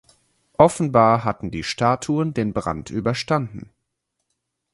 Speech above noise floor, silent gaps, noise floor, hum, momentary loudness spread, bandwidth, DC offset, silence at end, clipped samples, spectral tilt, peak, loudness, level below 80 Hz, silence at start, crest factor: 57 dB; none; -77 dBFS; none; 11 LU; 11.5 kHz; under 0.1%; 1.1 s; under 0.1%; -6 dB/octave; 0 dBFS; -20 LUFS; -48 dBFS; 0.6 s; 22 dB